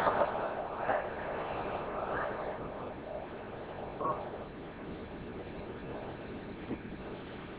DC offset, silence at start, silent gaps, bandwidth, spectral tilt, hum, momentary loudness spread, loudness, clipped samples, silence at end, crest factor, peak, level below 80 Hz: under 0.1%; 0 s; none; 5 kHz; -4.5 dB/octave; none; 10 LU; -39 LUFS; under 0.1%; 0 s; 24 dB; -14 dBFS; -56 dBFS